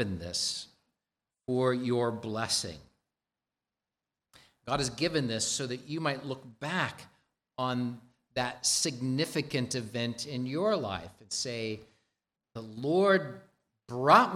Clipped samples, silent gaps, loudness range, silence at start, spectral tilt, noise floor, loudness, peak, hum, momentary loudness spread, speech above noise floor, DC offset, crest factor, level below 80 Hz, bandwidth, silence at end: under 0.1%; none; 3 LU; 0 s; -3.5 dB/octave; under -90 dBFS; -31 LUFS; -8 dBFS; none; 17 LU; over 59 dB; under 0.1%; 24 dB; -64 dBFS; 15.5 kHz; 0 s